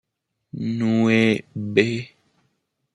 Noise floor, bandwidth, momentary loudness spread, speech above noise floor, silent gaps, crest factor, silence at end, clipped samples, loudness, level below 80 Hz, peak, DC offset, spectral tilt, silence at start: -76 dBFS; 10.5 kHz; 15 LU; 56 dB; none; 20 dB; 0.85 s; under 0.1%; -21 LUFS; -64 dBFS; -4 dBFS; under 0.1%; -6.5 dB/octave; 0.55 s